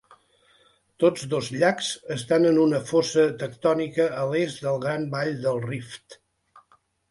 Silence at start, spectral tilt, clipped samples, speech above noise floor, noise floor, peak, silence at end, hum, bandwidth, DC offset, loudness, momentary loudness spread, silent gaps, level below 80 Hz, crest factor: 1 s; -5.5 dB/octave; under 0.1%; 39 dB; -63 dBFS; -6 dBFS; 0.5 s; none; 11.5 kHz; under 0.1%; -24 LUFS; 9 LU; none; -64 dBFS; 18 dB